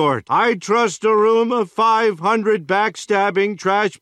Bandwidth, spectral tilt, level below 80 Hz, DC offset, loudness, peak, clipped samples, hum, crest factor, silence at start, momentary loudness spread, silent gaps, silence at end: 10.5 kHz; -4.5 dB/octave; -68 dBFS; under 0.1%; -17 LUFS; -4 dBFS; under 0.1%; none; 12 dB; 0 s; 4 LU; none; 0.05 s